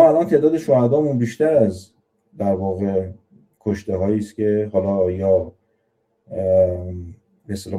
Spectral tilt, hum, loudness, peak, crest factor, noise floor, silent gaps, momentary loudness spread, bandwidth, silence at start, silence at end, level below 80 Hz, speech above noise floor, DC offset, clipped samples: -8.5 dB/octave; none; -19 LUFS; 0 dBFS; 18 dB; -68 dBFS; none; 16 LU; 12.5 kHz; 0 s; 0 s; -52 dBFS; 49 dB; under 0.1%; under 0.1%